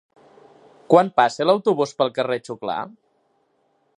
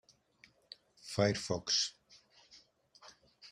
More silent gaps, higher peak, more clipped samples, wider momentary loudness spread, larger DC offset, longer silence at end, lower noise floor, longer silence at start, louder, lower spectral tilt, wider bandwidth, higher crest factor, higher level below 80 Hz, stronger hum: neither; first, -2 dBFS vs -16 dBFS; neither; second, 12 LU vs 26 LU; neither; first, 1.1 s vs 0 s; about the same, -66 dBFS vs -67 dBFS; second, 0.9 s vs 1.05 s; first, -20 LUFS vs -34 LUFS; first, -5.5 dB/octave vs -3.5 dB/octave; second, 10.5 kHz vs 13.5 kHz; about the same, 22 dB vs 24 dB; about the same, -72 dBFS vs -70 dBFS; neither